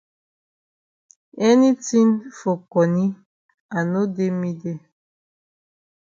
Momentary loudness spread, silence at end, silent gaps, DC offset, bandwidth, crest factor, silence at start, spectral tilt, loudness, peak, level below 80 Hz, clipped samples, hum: 14 LU; 1.35 s; 3.26-3.49 s, 3.60-3.69 s; under 0.1%; 7.6 kHz; 18 dB; 1.35 s; -6.5 dB/octave; -20 LUFS; -4 dBFS; -68 dBFS; under 0.1%; none